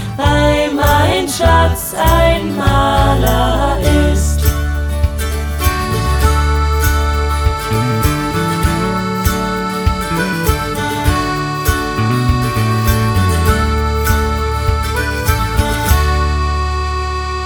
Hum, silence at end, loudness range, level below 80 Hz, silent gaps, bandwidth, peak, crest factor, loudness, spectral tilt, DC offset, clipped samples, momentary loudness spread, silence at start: none; 0 s; 3 LU; -18 dBFS; none; over 20 kHz; 0 dBFS; 14 dB; -14 LUFS; -5.5 dB/octave; under 0.1%; under 0.1%; 5 LU; 0 s